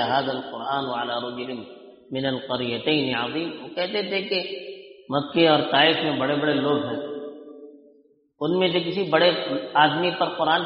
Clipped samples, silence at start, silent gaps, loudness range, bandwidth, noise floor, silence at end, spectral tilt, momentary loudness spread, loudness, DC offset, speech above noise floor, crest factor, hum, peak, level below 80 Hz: under 0.1%; 0 s; none; 5 LU; 5.6 kHz; -59 dBFS; 0 s; -2.5 dB/octave; 15 LU; -23 LUFS; under 0.1%; 36 dB; 22 dB; none; -2 dBFS; -68 dBFS